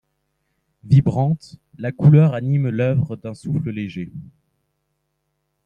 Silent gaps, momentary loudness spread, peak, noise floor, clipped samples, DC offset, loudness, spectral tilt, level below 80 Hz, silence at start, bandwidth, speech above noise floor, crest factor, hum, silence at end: none; 17 LU; -2 dBFS; -73 dBFS; under 0.1%; under 0.1%; -19 LUFS; -9.5 dB/octave; -52 dBFS; 0.85 s; 5.6 kHz; 55 dB; 18 dB; none; 1.45 s